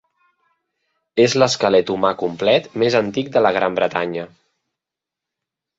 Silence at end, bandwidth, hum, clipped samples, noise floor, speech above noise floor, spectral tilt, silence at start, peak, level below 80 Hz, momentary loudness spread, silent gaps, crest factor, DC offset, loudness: 1.5 s; 8 kHz; none; under 0.1%; -86 dBFS; 68 dB; -4.5 dB/octave; 1.15 s; -2 dBFS; -60 dBFS; 10 LU; none; 18 dB; under 0.1%; -18 LUFS